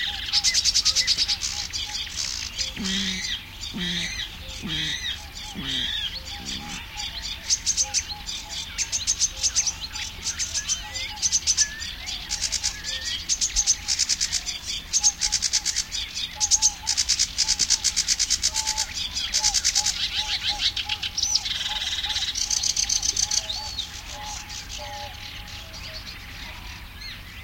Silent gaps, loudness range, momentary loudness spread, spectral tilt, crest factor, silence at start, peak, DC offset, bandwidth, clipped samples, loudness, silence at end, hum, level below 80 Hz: none; 7 LU; 14 LU; 0.5 dB/octave; 20 dB; 0 s; -6 dBFS; under 0.1%; 17 kHz; under 0.1%; -23 LUFS; 0 s; none; -44 dBFS